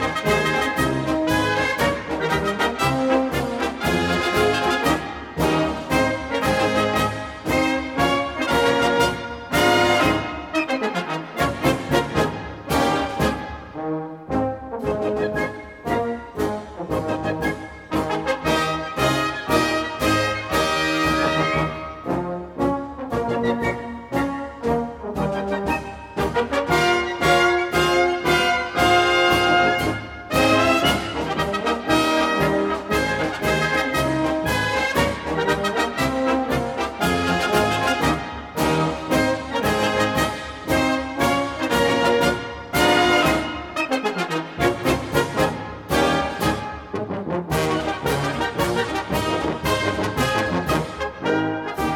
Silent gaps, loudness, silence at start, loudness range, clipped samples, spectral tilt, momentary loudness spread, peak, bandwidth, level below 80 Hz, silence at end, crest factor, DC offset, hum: none; -21 LUFS; 0 s; 6 LU; under 0.1%; -4.5 dB/octave; 9 LU; -4 dBFS; 18 kHz; -40 dBFS; 0 s; 18 dB; under 0.1%; none